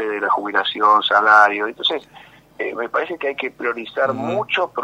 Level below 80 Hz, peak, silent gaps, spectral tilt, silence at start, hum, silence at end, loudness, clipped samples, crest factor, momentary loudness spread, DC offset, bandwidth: -66 dBFS; 0 dBFS; none; -4 dB/octave; 0 s; none; 0 s; -18 LUFS; under 0.1%; 18 dB; 12 LU; under 0.1%; 15.5 kHz